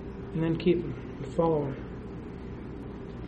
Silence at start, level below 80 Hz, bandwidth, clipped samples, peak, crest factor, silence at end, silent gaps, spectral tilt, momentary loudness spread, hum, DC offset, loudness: 0 s; -46 dBFS; 8.4 kHz; under 0.1%; -12 dBFS; 18 dB; 0 s; none; -9 dB/octave; 14 LU; none; under 0.1%; -32 LUFS